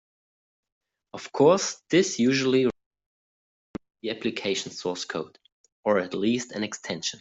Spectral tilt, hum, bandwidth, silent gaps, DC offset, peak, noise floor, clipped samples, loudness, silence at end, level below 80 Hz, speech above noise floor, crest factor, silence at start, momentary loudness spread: -4 dB/octave; none; 8.2 kHz; 2.86-2.91 s, 3.06-3.74 s, 5.52-5.64 s, 5.72-5.83 s; under 0.1%; -6 dBFS; under -90 dBFS; under 0.1%; -26 LUFS; 0.05 s; -66 dBFS; over 65 dB; 20 dB; 1.15 s; 19 LU